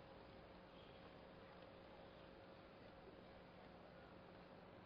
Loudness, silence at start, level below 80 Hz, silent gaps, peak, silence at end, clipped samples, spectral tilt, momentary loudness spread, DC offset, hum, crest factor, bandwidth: -62 LUFS; 0 s; -76 dBFS; none; -48 dBFS; 0 s; under 0.1%; -4 dB/octave; 1 LU; under 0.1%; none; 14 dB; 5.2 kHz